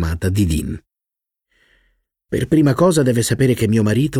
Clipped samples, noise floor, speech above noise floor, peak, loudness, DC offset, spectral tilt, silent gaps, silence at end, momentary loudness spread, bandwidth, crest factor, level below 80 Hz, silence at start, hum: under 0.1%; -86 dBFS; 70 dB; -4 dBFS; -17 LUFS; under 0.1%; -6.5 dB/octave; none; 0 s; 11 LU; 16.5 kHz; 14 dB; -34 dBFS; 0 s; none